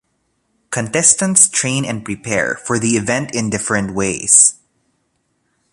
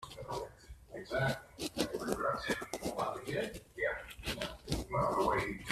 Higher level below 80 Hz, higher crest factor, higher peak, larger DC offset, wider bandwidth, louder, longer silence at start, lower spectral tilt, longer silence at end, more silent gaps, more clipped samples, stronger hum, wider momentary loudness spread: about the same, -50 dBFS vs -54 dBFS; about the same, 18 dB vs 22 dB; first, 0 dBFS vs -16 dBFS; neither; about the same, 16 kHz vs 15.5 kHz; first, -14 LUFS vs -37 LUFS; first, 0.7 s vs 0 s; second, -3 dB/octave vs -4.5 dB/octave; first, 1.2 s vs 0 s; neither; neither; neither; about the same, 12 LU vs 10 LU